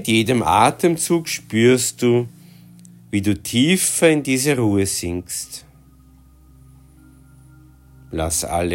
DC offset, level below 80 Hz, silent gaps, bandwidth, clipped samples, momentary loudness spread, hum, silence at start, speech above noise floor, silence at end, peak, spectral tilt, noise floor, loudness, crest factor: under 0.1%; -48 dBFS; none; 16.5 kHz; under 0.1%; 12 LU; none; 0 s; 31 dB; 0 s; -2 dBFS; -4 dB/octave; -49 dBFS; -18 LUFS; 18 dB